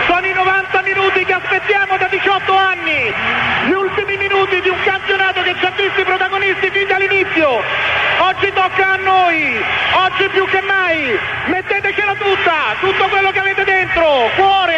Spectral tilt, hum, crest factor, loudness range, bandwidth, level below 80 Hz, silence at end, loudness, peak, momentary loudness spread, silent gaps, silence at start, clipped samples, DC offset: -4.5 dB/octave; none; 14 dB; 1 LU; 8.4 kHz; -46 dBFS; 0 s; -13 LUFS; 0 dBFS; 3 LU; none; 0 s; under 0.1%; under 0.1%